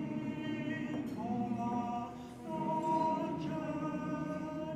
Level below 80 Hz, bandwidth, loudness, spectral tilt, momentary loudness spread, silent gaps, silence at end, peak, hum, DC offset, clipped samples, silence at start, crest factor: -66 dBFS; 13 kHz; -37 LUFS; -7.5 dB/octave; 7 LU; none; 0 s; -22 dBFS; none; under 0.1%; under 0.1%; 0 s; 14 dB